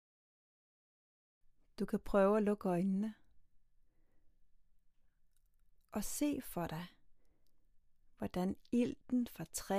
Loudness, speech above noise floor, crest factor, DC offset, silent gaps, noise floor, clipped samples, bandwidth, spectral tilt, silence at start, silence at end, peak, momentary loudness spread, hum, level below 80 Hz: -38 LUFS; 33 dB; 22 dB; under 0.1%; none; -69 dBFS; under 0.1%; 15.5 kHz; -6 dB/octave; 1.8 s; 0 s; -20 dBFS; 13 LU; none; -62 dBFS